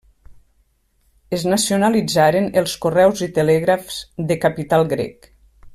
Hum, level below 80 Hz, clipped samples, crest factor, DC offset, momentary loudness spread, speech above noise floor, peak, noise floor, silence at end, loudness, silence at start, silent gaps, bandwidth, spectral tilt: none; -50 dBFS; under 0.1%; 16 dB; under 0.1%; 9 LU; 44 dB; -4 dBFS; -62 dBFS; 0.05 s; -18 LUFS; 0.3 s; none; 15.5 kHz; -5 dB/octave